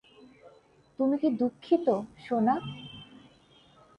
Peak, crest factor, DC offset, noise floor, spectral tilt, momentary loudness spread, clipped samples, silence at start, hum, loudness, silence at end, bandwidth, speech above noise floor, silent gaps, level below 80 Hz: -12 dBFS; 18 dB; under 0.1%; -60 dBFS; -8 dB/octave; 17 LU; under 0.1%; 0.45 s; none; -28 LUFS; 0.95 s; 9.4 kHz; 33 dB; none; -68 dBFS